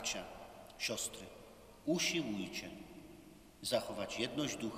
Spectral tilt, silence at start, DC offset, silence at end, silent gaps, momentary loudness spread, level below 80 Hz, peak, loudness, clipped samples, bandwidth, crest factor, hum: -3 dB/octave; 0 s; under 0.1%; 0 s; none; 21 LU; -66 dBFS; -22 dBFS; -39 LUFS; under 0.1%; 15.5 kHz; 20 dB; none